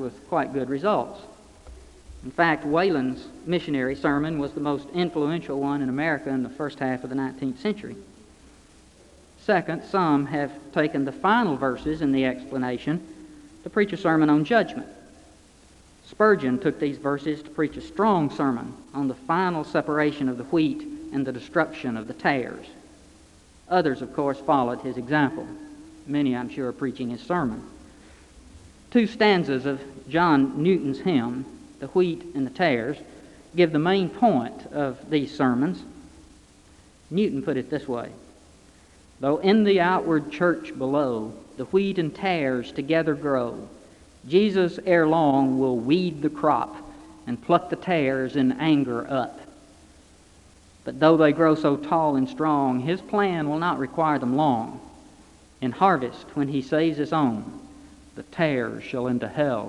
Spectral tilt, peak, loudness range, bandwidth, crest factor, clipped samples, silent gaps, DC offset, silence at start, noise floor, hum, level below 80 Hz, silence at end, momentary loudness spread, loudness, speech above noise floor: -7 dB/octave; -4 dBFS; 5 LU; 11 kHz; 22 dB; under 0.1%; none; under 0.1%; 0 s; -53 dBFS; none; -56 dBFS; 0 s; 13 LU; -24 LUFS; 29 dB